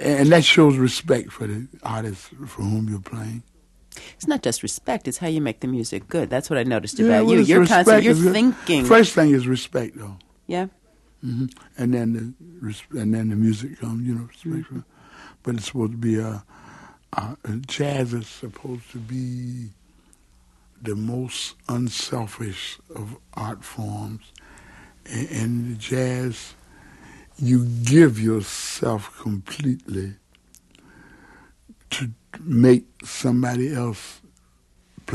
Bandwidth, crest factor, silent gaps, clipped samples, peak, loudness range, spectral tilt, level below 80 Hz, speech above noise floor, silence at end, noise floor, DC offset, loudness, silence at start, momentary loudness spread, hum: 12.5 kHz; 22 dB; none; under 0.1%; 0 dBFS; 13 LU; -5.5 dB/octave; -54 dBFS; 38 dB; 0 s; -59 dBFS; under 0.1%; -21 LUFS; 0 s; 21 LU; none